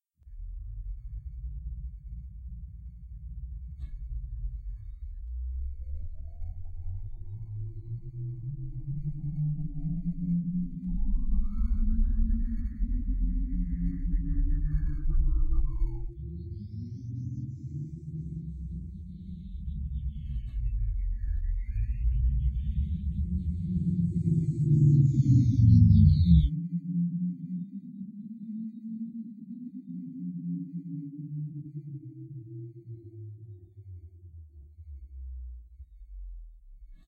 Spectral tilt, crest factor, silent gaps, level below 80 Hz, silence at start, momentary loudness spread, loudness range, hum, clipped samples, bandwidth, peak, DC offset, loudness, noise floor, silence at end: -10.5 dB/octave; 20 dB; none; -32 dBFS; 0.25 s; 21 LU; 20 LU; none; under 0.1%; 4.7 kHz; -8 dBFS; under 0.1%; -31 LUFS; -49 dBFS; 0.1 s